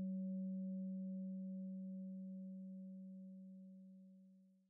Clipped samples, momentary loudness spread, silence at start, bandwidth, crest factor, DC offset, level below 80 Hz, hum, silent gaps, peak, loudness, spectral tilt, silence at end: under 0.1%; 17 LU; 0 s; 0.6 kHz; 10 dB; under 0.1%; under -90 dBFS; none; none; -40 dBFS; -49 LUFS; -9 dB/octave; 0.15 s